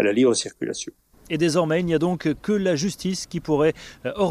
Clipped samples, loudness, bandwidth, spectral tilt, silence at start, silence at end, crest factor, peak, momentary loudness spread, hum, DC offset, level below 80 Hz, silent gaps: under 0.1%; -23 LUFS; 15 kHz; -5 dB/octave; 0 s; 0 s; 16 dB; -8 dBFS; 11 LU; none; under 0.1%; -52 dBFS; none